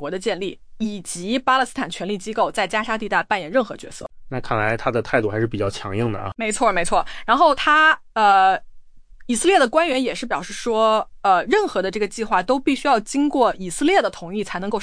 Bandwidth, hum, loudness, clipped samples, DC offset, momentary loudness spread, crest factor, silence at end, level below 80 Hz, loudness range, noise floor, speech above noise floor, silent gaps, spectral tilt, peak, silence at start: 10.5 kHz; none; -20 LUFS; under 0.1%; under 0.1%; 11 LU; 16 dB; 0 s; -44 dBFS; 5 LU; -41 dBFS; 22 dB; none; -4 dB/octave; -4 dBFS; 0 s